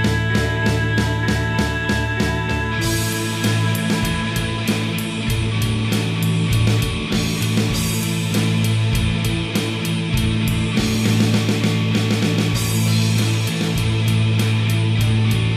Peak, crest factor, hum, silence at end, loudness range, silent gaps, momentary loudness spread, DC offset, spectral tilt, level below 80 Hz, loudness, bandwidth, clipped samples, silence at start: -6 dBFS; 12 dB; none; 0 s; 2 LU; none; 3 LU; under 0.1%; -5 dB/octave; -32 dBFS; -19 LUFS; 15.5 kHz; under 0.1%; 0 s